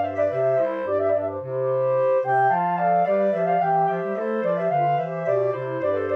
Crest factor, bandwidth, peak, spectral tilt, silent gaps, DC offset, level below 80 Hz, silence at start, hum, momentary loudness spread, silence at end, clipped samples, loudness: 12 dB; 6 kHz; -10 dBFS; -9 dB/octave; none; under 0.1%; -76 dBFS; 0 s; 50 Hz at -60 dBFS; 5 LU; 0 s; under 0.1%; -22 LUFS